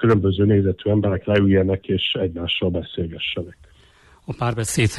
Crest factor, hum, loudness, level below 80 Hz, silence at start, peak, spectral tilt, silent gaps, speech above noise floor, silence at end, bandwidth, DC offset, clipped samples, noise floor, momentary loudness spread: 14 dB; none; -20 LUFS; -44 dBFS; 0 s; -6 dBFS; -5.5 dB/octave; none; 32 dB; 0 s; 14.5 kHz; under 0.1%; under 0.1%; -52 dBFS; 9 LU